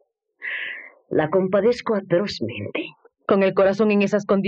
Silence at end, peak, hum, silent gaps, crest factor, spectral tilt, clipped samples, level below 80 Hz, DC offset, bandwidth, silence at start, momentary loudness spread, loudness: 0 s; -4 dBFS; none; none; 16 dB; -6.5 dB/octave; under 0.1%; -60 dBFS; under 0.1%; 7.8 kHz; 0.4 s; 13 LU; -21 LUFS